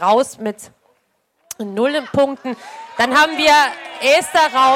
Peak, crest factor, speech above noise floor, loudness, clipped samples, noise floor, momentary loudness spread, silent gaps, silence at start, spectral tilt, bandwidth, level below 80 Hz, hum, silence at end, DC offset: -4 dBFS; 14 dB; 49 dB; -15 LUFS; under 0.1%; -65 dBFS; 18 LU; none; 0 s; -2.5 dB/octave; 17 kHz; -56 dBFS; none; 0 s; under 0.1%